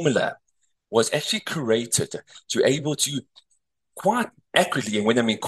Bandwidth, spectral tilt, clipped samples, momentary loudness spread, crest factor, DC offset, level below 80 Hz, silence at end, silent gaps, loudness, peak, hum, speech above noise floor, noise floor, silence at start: 13 kHz; -3.5 dB/octave; under 0.1%; 7 LU; 22 dB; under 0.1%; -66 dBFS; 0 s; none; -23 LUFS; -2 dBFS; none; 48 dB; -72 dBFS; 0 s